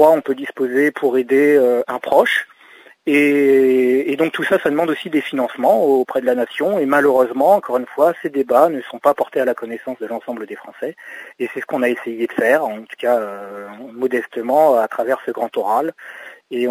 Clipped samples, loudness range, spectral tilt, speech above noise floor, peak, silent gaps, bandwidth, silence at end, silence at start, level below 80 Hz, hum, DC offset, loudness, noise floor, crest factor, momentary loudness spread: under 0.1%; 6 LU; -5.5 dB/octave; 29 dB; 0 dBFS; none; 16 kHz; 0 s; 0 s; -70 dBFS; none; under 0.1%; -17 LUFS; -46 dBFS; 16 dB; 15 LU